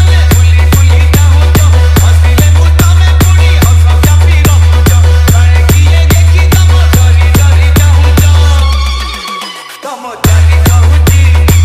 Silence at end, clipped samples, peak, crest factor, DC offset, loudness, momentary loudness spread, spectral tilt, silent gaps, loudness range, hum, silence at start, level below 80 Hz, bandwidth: 0 s; 1%; 0 dBFS; 4 dB; under 0.1%; -6 LUFS; 7 LU; -5 dB/octave; none; 3 LU; none; 0 s; -8 dBFS; 15.5 kHz